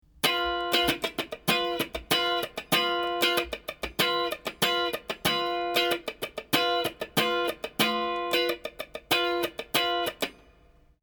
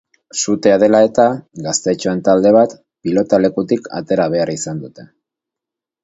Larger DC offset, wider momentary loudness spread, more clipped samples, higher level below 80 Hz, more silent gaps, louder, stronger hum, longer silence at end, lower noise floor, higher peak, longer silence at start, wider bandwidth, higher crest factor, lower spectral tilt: neither; second, 7 LU vs 14 LU; neither; about the same, -56 dBFS vs -54 dBFS; neither; second, -27 LUFS vs -15 LUFS; neither; second, 0.7 s vs 1 s; second, -59 dBFS vs -85 dBFS; second, -6 dBFS vs 0 dBFS; about the same, 0.25 s vs 0.35 s; first, over 20 kHz vs 8 kHz; first, 22 dB vs 16 dB; second, -2.5 dB/octave vs -5 dB/octave